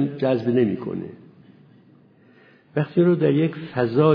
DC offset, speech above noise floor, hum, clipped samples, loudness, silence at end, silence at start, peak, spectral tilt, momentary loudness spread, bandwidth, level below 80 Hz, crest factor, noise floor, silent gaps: under 0.1%; 33 dB; none; under 0.1%; -22 LUFS; 0 s; 0 s; -4 dBFS; -11 dB/octave; 12 LU; 5.4 kHz; -66 dBFS; 18 dB; -53 dBFS; none